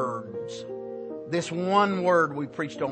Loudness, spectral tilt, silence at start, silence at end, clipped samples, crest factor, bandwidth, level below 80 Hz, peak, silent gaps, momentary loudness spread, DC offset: -27 LUFS; -5.5 dB/octave; 0 s; 0 s; under 0.1%; 20 dB; 8.8 kHz; -72 dBFS; -8 dBFS; none; 14 LU; under 0.1%